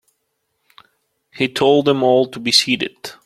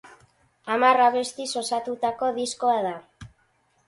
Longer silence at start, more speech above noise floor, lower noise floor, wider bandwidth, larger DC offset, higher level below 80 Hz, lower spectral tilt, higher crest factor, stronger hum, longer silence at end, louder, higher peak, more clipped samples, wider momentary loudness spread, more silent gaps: first, 1.35 s vs 0.05 s; first, 55 dB vs 43 dB; first, -71 dBFS vs -66 dBFS; first, 15 kHz vs 11.5 kHz; neither; about the same, -60 dBFS vs -64 dBFS; about the same, -3.5 dB/octave vs -2.5 dB/octave; about the same, 18 dB vs 18 dB; neither; second, 0.15 s vs 0.6 s; first, -16 LUFS vs -24 LUFS; first, 0 dBFS vs -6 dBFS; neither; second, 8 LU vs 12 LU; neither